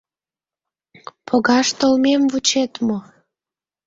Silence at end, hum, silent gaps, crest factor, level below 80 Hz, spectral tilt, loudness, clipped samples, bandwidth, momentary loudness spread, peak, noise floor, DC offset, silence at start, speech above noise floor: 0.85 s; none; none; 18 dB; -62 dBFS; -3 dB/octave; -17 LUFS; under 0.1%; 7.8 kHz; 8 LU; -2 dBFS; under -90 dBFS; under 0.1%; 1.3 s; over 73 dB